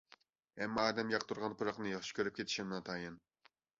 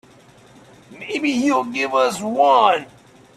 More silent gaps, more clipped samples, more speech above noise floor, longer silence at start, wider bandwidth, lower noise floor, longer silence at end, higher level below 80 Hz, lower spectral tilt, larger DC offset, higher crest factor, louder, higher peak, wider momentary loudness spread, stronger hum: neither; neither; about the same, 29 dB vs 30 dB; second, 0.55 s vs 0.9 s; second, 7.6 kHz vs 14 kHz; first, -68 dBFS vs -48 dBFS; about the same, 0.6 s vs 0.5 s; second, -74 dBFS vs -64 dBFS; about the same, -2.5 dB/octave vs -3.5 dB/octave; neither; about the same, 22 dB vs 20 dB; second, -39 LUFS vs -18 LUFS; second, -18 dBFS vs 0 dBFS; about the same, 10 LU vs 10 LU; neither